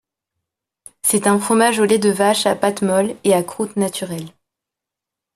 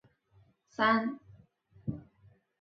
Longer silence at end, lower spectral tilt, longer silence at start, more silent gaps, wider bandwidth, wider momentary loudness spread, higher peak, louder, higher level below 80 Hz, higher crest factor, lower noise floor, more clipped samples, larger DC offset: first, 1.05 s vs 0.6 s; about the same, -4 dB/octave vs -3.5 dB/octave; first, 1.05 s vs 0.8 s; neither; first, 14.5 kHz vs 6.8 kHz; second, 10 LU vs 21 LU; first, 0 dBFS vs -12 dBFS; first, -17 LUFS vs -32 LUFS; about the same, -62 dBFS vs -66 dBFS; about the same, 18 dB vs 22 dB; first, -85 dBFS vs -66 dBFS; neither; neither